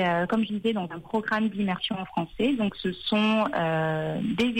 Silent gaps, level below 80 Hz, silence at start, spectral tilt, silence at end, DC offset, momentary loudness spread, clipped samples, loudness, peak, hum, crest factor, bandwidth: none; -58 dBFS; 0 s; -6.5 dB/octave; 0 s; under 0.1%; 7 LU; under 0.1%; -27 LUFS; -14 dBFS; none; 12 dB; 16 kHz